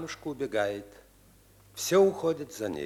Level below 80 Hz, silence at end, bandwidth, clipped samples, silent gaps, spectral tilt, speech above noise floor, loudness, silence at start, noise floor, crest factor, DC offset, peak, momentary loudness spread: -64 dBFS; 0 s; 15 kHz; under 0.1%; none; -4.5 dB/octave; 30 dB; -29 LUFS; 0 s; -59 dBFS; 18 dB; under 0.1%; -12 dBFS; 14 LU